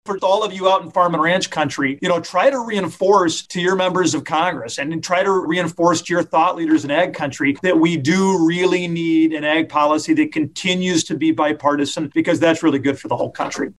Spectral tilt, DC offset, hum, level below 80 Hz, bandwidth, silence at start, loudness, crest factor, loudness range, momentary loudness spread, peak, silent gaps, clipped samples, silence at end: -4.5 dB/octave; under 0.1%; none; -60 dBFS; 12 kHz; 0.05 s; -18 LUFS; 14 dB; 1 LU; 5 LU; -2 dBFS; none; under 0.1%; 0.05 s